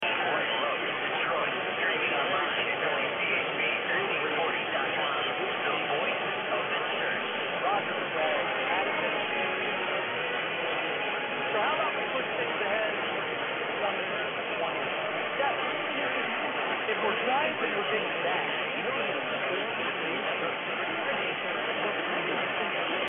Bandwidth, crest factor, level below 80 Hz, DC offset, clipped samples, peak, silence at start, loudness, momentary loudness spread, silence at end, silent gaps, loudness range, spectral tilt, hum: 3.9 kHz; 16 dB; -74 dBFS; under 0.1%; under 0.1%; -14 dBFS; 0 s; -29 LUFS; 3 LU; 0 s; none; 2 LU; 0 dB/octave; none